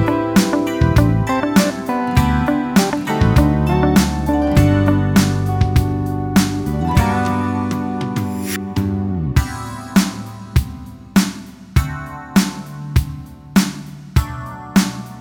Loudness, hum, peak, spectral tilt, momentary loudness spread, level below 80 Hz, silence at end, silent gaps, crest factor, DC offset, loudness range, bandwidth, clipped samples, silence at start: -17 LUFS; none; 0 dBFS; -6 dB/octave; 10 LU; -26 dBFS; 0 s; none; 16 dB; under 0.1%; 5 LU; 19.5 kHz; under 0.1%; 0 s